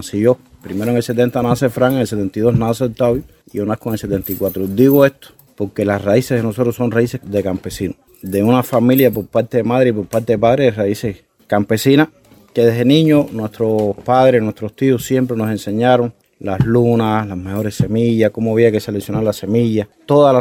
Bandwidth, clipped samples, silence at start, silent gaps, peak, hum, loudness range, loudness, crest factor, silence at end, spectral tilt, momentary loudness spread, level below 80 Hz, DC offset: 17.5 kHz; under 0.1%; 0 s; none; 0 dBFS; none; 2 LU; -16 LUFS; 16 dB; 0 s; -7 dB/octave; 10 LU; -46 dBFS; under 0.1%